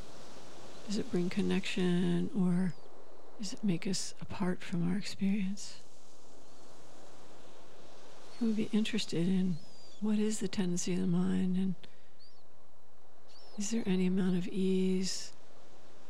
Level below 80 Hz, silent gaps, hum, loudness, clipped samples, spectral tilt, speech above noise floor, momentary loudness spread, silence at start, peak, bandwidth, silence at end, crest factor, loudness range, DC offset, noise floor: -74 dBFS; none; none; -34 LUFS; under 0.1%; -5.5 dB/octave; 32 dB; 19 LU; 0 s; -18 dBFS; 12 kHz; 0.8 s; 16 dB; 6 LU; 2%; -65 dBFS